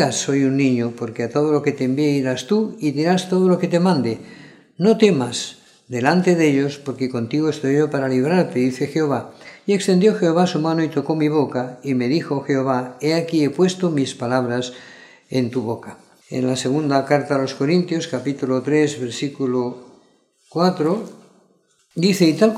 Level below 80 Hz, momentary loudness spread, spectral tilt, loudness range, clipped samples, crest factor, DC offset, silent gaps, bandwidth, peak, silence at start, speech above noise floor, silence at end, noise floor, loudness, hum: -68 dBFS; 10 LU; -6 dB/octave; 4 LU; under 0.1%; 18 dB; under 0.1%; none; 14.5 kHz; 0 dBFS; 0 s; 41 dB; 0 s; -60 dBFS; -19 LUFS; none